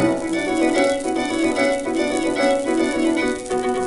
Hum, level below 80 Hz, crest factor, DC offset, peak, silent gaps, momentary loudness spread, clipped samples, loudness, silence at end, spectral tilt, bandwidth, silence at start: none; -46 dBFS; 14 dB; under 0.1%; -6 dBFS; none; 4 LU; under 0.1%; -20 LUFS; 0 s; -4 dB/octave; 11.5 kHz; 0 s